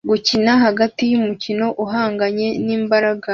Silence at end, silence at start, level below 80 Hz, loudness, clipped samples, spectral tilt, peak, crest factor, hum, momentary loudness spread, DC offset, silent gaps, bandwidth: 0 s; 0.05 s; -56 dBFS; -17 LUFS; under 0.1%; -5 dB/octave; -2 dBFS; 16 dB; none; 6 LU; under 0.1%; none; 7.2 kHz